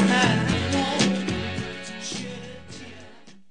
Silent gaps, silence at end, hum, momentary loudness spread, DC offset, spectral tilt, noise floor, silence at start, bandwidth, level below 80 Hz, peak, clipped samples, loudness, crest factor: none; 0.2 s; none; 20 LU; 0.4%; -4.5 dB/octave; -49 dBFS; 0 s; 10 kHz; -52 dBFS; -6 dBFS; under 0.1%; -24 LUFS; 18 dB